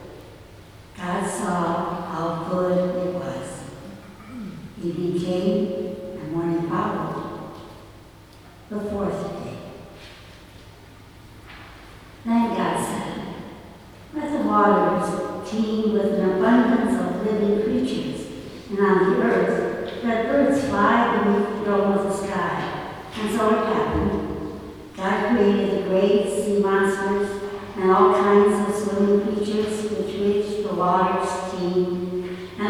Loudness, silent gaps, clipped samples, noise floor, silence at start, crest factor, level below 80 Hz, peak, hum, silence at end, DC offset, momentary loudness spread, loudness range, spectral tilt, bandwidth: -22 LUFS; none; under 0.1%; -46 dBFS; 0 s; 18 dB; -48 dBFS; -4 dBFS; none; 0 s; under 0.1%; 18 LU; 10 LU; -6.5 dB/octave; 14.5 kHz